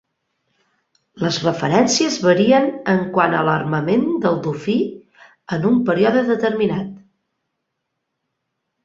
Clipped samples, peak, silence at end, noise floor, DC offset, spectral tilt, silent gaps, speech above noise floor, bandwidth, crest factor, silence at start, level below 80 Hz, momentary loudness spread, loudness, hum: under 0.1%; -2 dBFS; 1.85 s; -76 dBFS; under 0.1%; -5 dB/octave; none; 59 dB; 7.8 kHz; 18 dB; 1.15 s; -58 dBFS; 7 LU; -18 LUFS; none